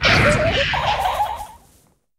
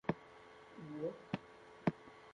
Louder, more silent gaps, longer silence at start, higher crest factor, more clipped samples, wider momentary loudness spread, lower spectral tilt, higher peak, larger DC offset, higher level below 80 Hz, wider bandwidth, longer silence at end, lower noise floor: first, -18 LUFS vs -44 LUFS; neither; about the same, 0 s vs 0.05 s; second, 18 dB vs 24 dB; neither; about the same, 15 LU vs 17 LU; second, -4 dB/octave vs -8 dB/octave; first, -2 dBFS vs -20 dBFS; neither; first, -34 dBFS vs -72 dBFS; first, 16 kHz vs 10 kHz; first, 0.65 s vs 0 s; about the same, -57 dBFS vs -59 dBFS